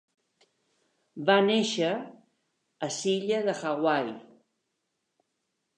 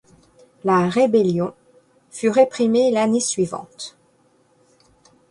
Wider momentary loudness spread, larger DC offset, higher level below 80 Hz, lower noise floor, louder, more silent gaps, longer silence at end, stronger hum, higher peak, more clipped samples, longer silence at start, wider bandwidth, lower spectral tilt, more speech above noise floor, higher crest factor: about the same, 15 LU vs 17 LU; neither; second, -84 dBFS vs -62 dBFS; first, -80 dBFS vs -59 dBFS; second, -27 LUFS vs -19 LUFS; neither; first, 1.55 s vs 1.4 s; neither; second, -8 dBFS vs -4 dBFS; neither; first, 1.15 s vs 0.65 s; about the same, 11 kHz vs 11.5 kHz; about the same, -4 dB/octave vs -5 dB/octave; first, 54 dB vs 41 dB; about the same, 22 dB vs 18 dB